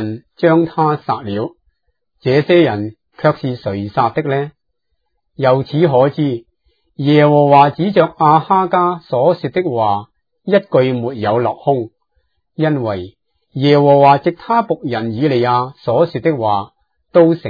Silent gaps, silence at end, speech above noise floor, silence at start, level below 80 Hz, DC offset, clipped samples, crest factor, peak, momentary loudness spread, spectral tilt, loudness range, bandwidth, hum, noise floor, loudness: none; 0 s; 58 dB; 0 s; -58 dBFS; under 0.1%; under 0.1%; 14 dB; 0 dBFS; 12 LU; -9.5 dB/octave; 5 LU; 5 kHz; none; -71 dBFS; -14 LUFS